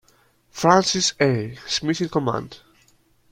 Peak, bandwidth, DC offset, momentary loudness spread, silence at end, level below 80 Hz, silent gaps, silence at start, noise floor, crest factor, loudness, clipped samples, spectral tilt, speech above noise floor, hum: -2 dBFS; 16.5 kHz; under 0.1%; 13 LU; 0.75 s; -56 dBFS; none; 0.55 s; -59 dBFS; 22 dB; -21 LUFS; under 0.1%; -4 dB/octave; 39 dB; none